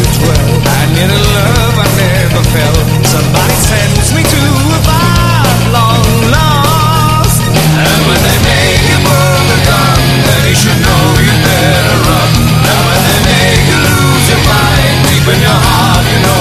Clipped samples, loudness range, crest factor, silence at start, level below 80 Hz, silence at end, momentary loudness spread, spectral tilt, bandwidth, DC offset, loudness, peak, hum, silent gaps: 0.7%; 1 LU; 8 dB; 0 s; -18 dBFS; 0 s; 2 LU; -4.5 dB/octave; 14.5 kHz; under 0.1%; -7 LUFS; 0 dBFS; none; none